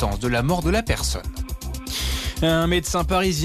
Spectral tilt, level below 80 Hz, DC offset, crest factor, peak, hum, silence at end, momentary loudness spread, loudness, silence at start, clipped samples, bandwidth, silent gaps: -4.5 dB/octave; -30 dBFS; under 0.1%; 12 dB; -10 dBFS; none; 0 s; 11 LU; -23 LUFS; 0 s; under 0.1%; 14 kHz; none